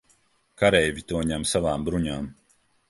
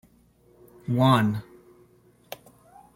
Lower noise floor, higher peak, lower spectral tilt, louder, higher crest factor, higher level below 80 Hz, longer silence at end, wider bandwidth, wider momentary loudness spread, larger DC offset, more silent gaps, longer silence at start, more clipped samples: first, -64 dBFS vs -59 dBFS; first, -4 dBFS vs -8 dBFS; second, -4.5 dB/octave vs -7 dB/octave; about the same, -24 LUFS vs -23 LUFS; about the same, 22 dB vs 20 dB; first, -44 dBFS vs -62 dBFS; second, 0.55 s vs 1.55 s; second, 12 kHz vs 16.5 kHz; second, 11 LU vs 23 LU; neither; neither; second, 0.6 s vs 0.9 s; neither